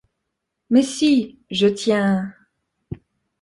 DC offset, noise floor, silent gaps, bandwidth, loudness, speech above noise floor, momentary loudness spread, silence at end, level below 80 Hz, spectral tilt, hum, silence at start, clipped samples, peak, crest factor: under 0.1%; -78 dBFS; none; 11.5 kHz; -19 LUFS; 60 dB; 20 LU; 0.45 s; -56 dBFS; -5 dB/octave; none; 0.7 s; under 0.1%; -6 dBFS; 16 dB